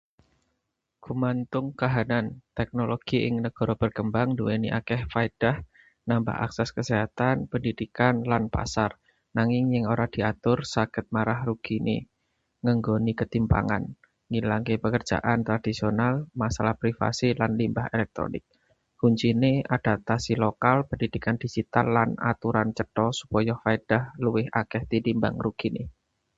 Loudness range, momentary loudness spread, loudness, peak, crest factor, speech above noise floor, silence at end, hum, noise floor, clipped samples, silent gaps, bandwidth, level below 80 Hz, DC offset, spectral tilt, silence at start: 2 LU; 6 LU; -26 LUFS; -4 dBFS; 22 dB; 55 dB; 0.45 s; none; -80 dBFS; under 0.1%; none; 8 kHz; -48 dBFS; under 0.1%; -7 dB/octave; 1.05 s